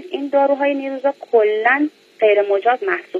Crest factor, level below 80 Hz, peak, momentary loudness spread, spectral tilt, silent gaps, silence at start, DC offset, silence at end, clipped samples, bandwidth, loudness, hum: 16 dB; -82 dBFS; -2 dBFS; 6 LU; -5 dB/octave; none; 0 s; under 0.1%; 0 s; under 0.1%; 7 kHz; -17 LUFS; none